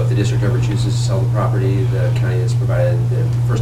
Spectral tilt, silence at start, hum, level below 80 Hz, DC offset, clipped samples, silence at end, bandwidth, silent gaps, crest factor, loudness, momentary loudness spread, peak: -7 dB/octave; 0 s; none; -34 dBFS; under 0.1%; under 0.1%; 0 s; 9.4 kHz; none; 12 dB; -17 LUFS; 1 LU; -4 dBFS